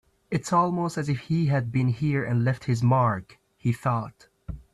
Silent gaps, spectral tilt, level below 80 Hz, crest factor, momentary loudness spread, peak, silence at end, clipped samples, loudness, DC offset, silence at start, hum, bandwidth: none; -7.5 dB/octave; -52 dBFS; 16 dB; 9 LU; -10 dBFS; 0.15 s; under 0.1%; -25 LUFS; under 0.1%; 0.3 s; none; 12 kHz